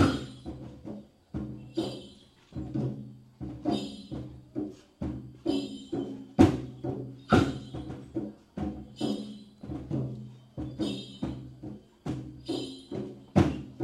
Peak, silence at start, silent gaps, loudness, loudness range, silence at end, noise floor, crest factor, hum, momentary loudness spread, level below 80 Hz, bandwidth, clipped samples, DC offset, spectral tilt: -4 dBFS; 0 s; none; -33 LUFS; 9 LU; 0 s; -54 dBFS; 28 dB; none; 18 LU; -50 dBFS; 13 kHz; under 0.1%; under 0.1%; -7 dB/octave